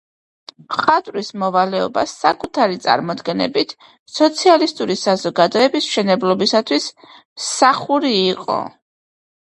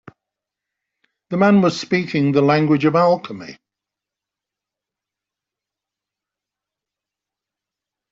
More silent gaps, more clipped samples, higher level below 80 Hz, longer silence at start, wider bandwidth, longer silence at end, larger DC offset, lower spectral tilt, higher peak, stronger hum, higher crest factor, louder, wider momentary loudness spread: first, 3.99-4.06 s, 7.25-7.36 s vs none; neither; about the same, -62 dBFS vs -64 dBFS; second, 0.7 s vs 1.3 s; first, 11.5 kHz vs 7.8 kHz; second, 0.9 s vs 4.6 s; neither; second, -4 dB/octave vs -7 dB/octave; about the same, 0 dBFS vs -2 dBFS; neither; about the same, 18 dB vs 20 dB; about the same, -17 LUFS vs -17 LUFS; second, 9 LU vs 16 LU